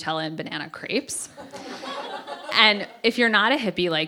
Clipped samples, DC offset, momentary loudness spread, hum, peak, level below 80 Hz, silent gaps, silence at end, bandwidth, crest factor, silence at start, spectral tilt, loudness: under 0.1%; under 0.1%; 18 LU; none; -2 dBFS; -66 dBFS; none; 0 s; 17 kHz; 24 dB; 0 s; -3 dB/octave; -22 LUFS